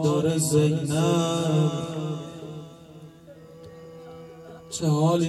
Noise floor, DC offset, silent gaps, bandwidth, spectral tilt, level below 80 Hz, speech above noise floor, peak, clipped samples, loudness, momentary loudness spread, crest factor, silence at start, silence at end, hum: -47 dBFS; under 0.1%; none; 13.5 kHz; -6 dB/octave; -64 dBFS; 24 dB; -10 dBFS; under 0.1%; -24 LUFS; 23 LU; 16 dB; 0 s; 0 s; none